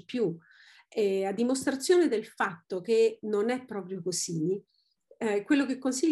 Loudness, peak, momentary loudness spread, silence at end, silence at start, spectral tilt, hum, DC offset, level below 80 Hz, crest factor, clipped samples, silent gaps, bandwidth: -29 LUFS; -12 dBFS; 10 LU; 0 s; 0.1 s; -4.5 dB/octave; none; under 0.1%; -78 dBFS; 16 dB; under 0.1%; none; 12.5 kHz